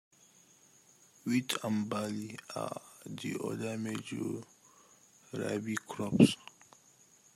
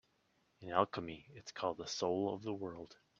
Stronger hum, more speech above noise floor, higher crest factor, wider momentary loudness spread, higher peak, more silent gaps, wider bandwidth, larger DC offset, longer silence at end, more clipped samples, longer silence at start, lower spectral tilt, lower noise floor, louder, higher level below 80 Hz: neither; second, 30 dB vs 37 dB; about the same, 28 dB vs 26 dB; first, 18 LU vs 15 LU; first, -8 dBFS vs -16 dBFS; neither; first, 16 kHz vs 8 kHz; neither; first, 0.9 s vs 0.25 s; neither; first, 1.25 s vs 0.6 s; about the same, -5.5 dB/octave vs -4.5 dB/octave; second, -63 dBFS vs -77 dBFS; first, -34 LUFS vs -39 LUFS; about the same, -70 dBFS vs -74 dBFS